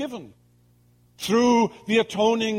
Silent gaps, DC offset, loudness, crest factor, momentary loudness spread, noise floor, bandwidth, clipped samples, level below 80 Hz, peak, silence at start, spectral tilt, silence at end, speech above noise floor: none; under 0.1%; -22 LUFS; 16 dB; 14 LU; -59 dBFS; 16 kHz; under 0.1%; -64 dBFS; -8 dBFS; 0 s; -4.5 dB/octave; 0 s; 37 dB